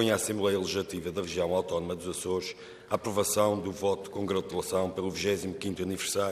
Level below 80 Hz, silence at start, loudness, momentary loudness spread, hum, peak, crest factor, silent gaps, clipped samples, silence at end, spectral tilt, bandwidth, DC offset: -60 dBFS; 0 s; -31 LUFS; 7 LU; none; -12 dBFS; 20 dB; none; under 0.1%; 0 s; -4 dB/octave; 15 kHz; under 0.1%